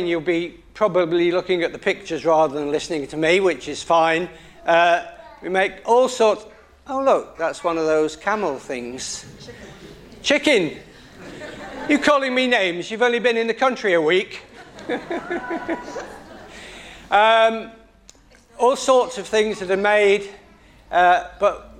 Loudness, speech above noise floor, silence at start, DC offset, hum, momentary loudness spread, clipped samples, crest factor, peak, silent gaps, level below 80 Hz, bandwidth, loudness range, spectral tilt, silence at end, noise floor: -20 LUFS; 31 dB; 0 s; under 0.1%; none; 20 LU; under 0.1%; 20 dB; -2 dBFS; none; -54 dBFS; 12.5 kHz; 4 LU; -3.5 dB/octave; 0.05 s; -50 dBFS